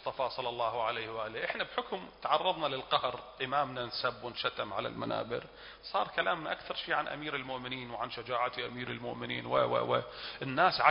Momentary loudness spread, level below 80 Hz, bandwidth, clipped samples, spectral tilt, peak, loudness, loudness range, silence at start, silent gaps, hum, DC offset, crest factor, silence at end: 9 LU; -66 dBFS; 5.4 kHz; under 0.1%; -1.5 dB/octave; -8 dBFS; -34 LUFS; 2 LU; 0 s; none; none; under 0.1%; 26 dB; 0 s